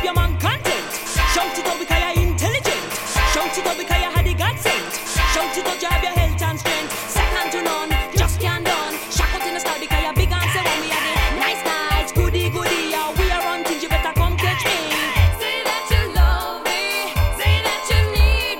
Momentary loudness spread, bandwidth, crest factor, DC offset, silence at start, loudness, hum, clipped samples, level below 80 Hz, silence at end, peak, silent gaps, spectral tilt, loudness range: 4 LU; 17 kHz; 18 dB; under 0.1%; 0 s; -19 LUFS; none; under 0.1%; -24 dBFS; 0 s; -2 dBFS; none; -3.5 dB/octave; 1 LU